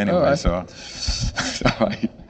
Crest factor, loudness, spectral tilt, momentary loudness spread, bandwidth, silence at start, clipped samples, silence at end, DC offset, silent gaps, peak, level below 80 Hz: 20 dB; -22 LUFS; -4.5 dB/octave; 10 LU; 9 kHz; 0 s; under 0.1%; 0 s; under 0.1%; none; -2 dBFS; -32 dBFS